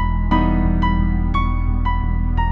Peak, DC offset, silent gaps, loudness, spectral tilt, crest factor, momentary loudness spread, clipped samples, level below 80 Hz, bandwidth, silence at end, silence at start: -4 dBFS; under 0.1%; none; -20 LUFS; -9 dB/octave; 12 dB; 3 LU; under 0.1%; -18 dBFS; 4.3 kHz; 0 s; 0 s